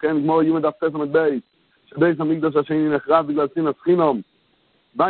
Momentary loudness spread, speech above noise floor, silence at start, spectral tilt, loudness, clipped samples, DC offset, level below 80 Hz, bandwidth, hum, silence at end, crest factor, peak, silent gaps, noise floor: 6 LU; 43 dB; 0 s; -12 dB/octave; -20 LUFS; under 0.1%; under 0.1%; -62 dBFS; 4.4 kHz; none; 0 s; 18 dB; -2 dBFS; none; -62 dBFS